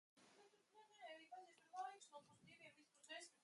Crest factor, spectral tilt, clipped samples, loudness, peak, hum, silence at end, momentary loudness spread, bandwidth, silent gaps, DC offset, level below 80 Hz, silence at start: 20 dB; -1.5 dB/octave; under 0.1%; -60 LUFS; -42 dBFS; none; 0 s; 11 LU; 11.5 kHz; none; under 0.1%; under -90 dBFS; 0.15 s